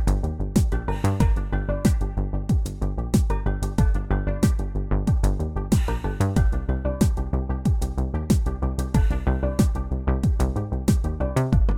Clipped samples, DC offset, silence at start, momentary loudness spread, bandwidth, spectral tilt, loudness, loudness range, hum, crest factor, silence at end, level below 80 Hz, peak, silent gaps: under 0.1%; under 0.1%; 0 s; 5 LU; 15.5 kHz; -7 dB/octave; -24 LUFS; 1 LU; none; 16 dB; 0 s; -24 dBFS; -6 dBFS; none